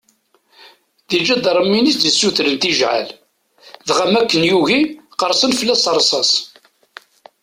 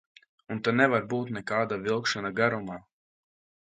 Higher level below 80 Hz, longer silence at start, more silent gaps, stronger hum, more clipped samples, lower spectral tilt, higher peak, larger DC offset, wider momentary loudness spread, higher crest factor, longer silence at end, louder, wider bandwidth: first, -58 dBFS vs -68 dBFS; first, 1.1 s vs 0.5 s; neither; neither; neither; second, -2.5 dB/octave vs -5.5 dB/octave; first, -2 dBFS vs -8 dBFS; neither; second, 8 LU vs 13 LU; second, 16 dB vs 22 dB; about the same, 0.95 s vs 1 s; first, -14 LUFS vs -28 LUFS; first, 16 kHz vs 9.2 kHz